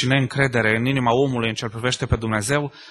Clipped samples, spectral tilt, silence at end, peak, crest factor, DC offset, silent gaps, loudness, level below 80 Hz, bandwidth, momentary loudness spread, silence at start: under 0.1%; -5 dB/octave; 0 s; -2 dBFS; 18 dB; under 0.1%; none; -21 LUFS; -40 dBFS; 12.5 kHz; 5 LU; 0 s